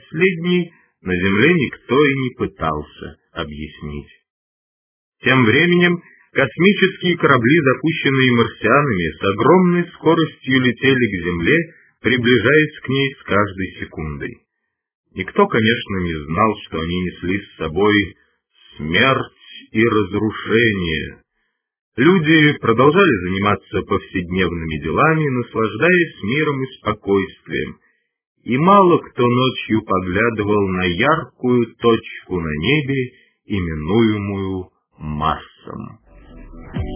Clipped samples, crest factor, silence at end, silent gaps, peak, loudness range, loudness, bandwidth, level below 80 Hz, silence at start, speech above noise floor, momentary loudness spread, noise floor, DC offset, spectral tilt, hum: under 0.1%; 18 dB; 0 s; 4.30-5.12 s, 14.95-15.04 s, 21.81-21.92 s, 28.27-28.35 s; 0 dBFS; 6 LU; -17 LUFS; 3.5 kHz; -40 dBFS; 0.1 s; 59 dB; 16 LU; -76 dBFS; under 0.1%; -10 dB/octave; none